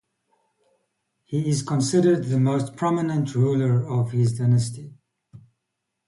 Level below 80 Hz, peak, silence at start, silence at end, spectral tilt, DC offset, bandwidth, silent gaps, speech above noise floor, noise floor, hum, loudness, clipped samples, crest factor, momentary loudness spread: -60 dBFS; -8 dBFS; 1.3 s; 0.7 s; -7 dB/octave; under 0.1%; 11.5 kHz; none; 59 dB; -80 dBFS; none; -22 LUFS; under 0.1%; 16 dB; 6 LU